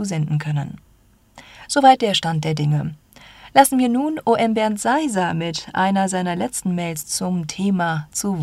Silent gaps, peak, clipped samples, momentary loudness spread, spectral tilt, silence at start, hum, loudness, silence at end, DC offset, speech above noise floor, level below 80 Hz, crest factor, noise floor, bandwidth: none; 0 dBFS; under 0.1%; 10 LU; -5 dB/octave; 0 s; none; -19 LUFS; 0 s; under 0.1%; 35 dB; -56 dBFS; 20 dB; -54 dBFS; 16 kHz